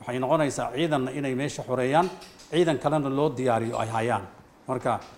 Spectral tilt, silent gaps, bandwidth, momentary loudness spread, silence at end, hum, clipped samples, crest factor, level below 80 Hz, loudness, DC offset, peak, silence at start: -6 dB/octave; none; 16 kHz; 7 LU; 0 s; none; under 0.1%; 18 dB; -58 dBFS; -26 LUFS; under 0.1%; -8 dBFS; 0 s